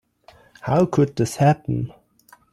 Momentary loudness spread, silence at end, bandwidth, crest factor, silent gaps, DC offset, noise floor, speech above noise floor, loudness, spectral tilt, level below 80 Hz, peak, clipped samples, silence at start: 12 LU; 0.6 s; 13 kHz; 16 dB; none; under 0.1%; -54 dBFS; 35 dB; -20 LUFS; -7 dB/octave; -52 dBFS; -6 dBFS; under 0.1%; 0.65 s